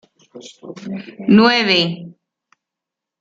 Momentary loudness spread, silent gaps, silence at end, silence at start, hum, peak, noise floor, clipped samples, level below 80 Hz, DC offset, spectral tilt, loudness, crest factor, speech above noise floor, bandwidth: 23 LU; none; 1.1 s; 0.35 s; none; -2 dBFS; -84 dBFS; under 0.1%; -62 dBFS; under 0.1%; -5.5 dB/octave; -14 LUFS; 18 dB; 68 dB; 7.6 kHz